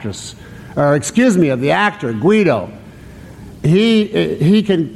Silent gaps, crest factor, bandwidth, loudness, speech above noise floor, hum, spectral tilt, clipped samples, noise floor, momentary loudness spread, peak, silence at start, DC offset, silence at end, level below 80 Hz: none; 12 dB; 13 kHz; -14 LUFS; 22 dB; none; -6 dB/octave; under 0.1%; -36 dBFS; 14 LU; -2 dBFS; 0 s; under 0.1%; 0 s; -46 dBFS